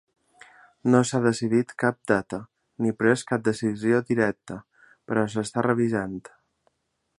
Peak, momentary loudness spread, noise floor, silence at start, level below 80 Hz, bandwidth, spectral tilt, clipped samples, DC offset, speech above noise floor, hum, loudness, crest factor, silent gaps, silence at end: -4 dBFS; 14 LU; -76 dBFS; 0.85 s; -62 dBFS; 11.5 kHz; -6 dB/octave; under 0.1%; under 0.1%; 52 dB; none; -24 LUFS; 22 dB; none; 1 s